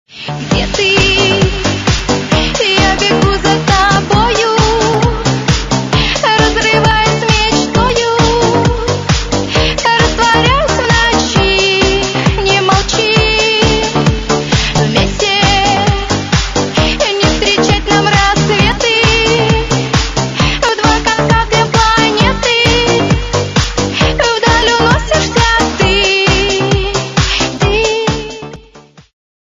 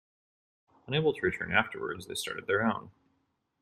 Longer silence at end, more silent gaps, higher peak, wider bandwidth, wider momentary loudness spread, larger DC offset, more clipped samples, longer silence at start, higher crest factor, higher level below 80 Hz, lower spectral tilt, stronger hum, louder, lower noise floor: about the same, 0.6 s vs 0.7 s; neither; first, 0 dBFS vs -8 dBFS; second, 10.5 kHz vs 14.5 kHz; second, 5 LU vs 8 LU; neither; neither; second, 0.1 s vs 0.85 s; second, 12 dB vs 26 dB; first, -22 dBFS vs -64 dBFS; about the same, -4 dB/octave vs -4.5 dB/octave; neither; first, -10 LUFS vs -31 LUFS; second, -39 dBFS vs -77 dBFS